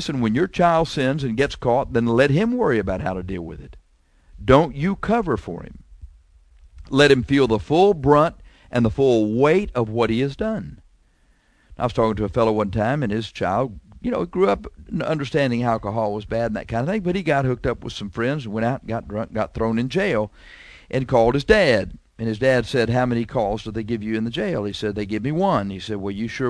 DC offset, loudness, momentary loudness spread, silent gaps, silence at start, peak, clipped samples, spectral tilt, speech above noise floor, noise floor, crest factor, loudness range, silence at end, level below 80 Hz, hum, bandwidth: under 0.1%; -21 LUFS; 11 LU; none; 0 s; 0 dBFS; under 0.1%; -7 dB/octave; 39 dB; -59 dBFS; 20 dB; 5 LU; 0 s; -42 dBFS; none; 11 kHz